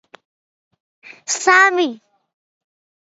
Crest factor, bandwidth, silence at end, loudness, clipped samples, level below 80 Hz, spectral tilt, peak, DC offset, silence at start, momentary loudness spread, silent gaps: 20 dB; 8.2 kHz; 1.15 s; -15 LUFS; under 0.1%; -74 dBFS; 0 dB/octave; 0 dBFS; under 0.1%; 1.1 s; 13 LU; none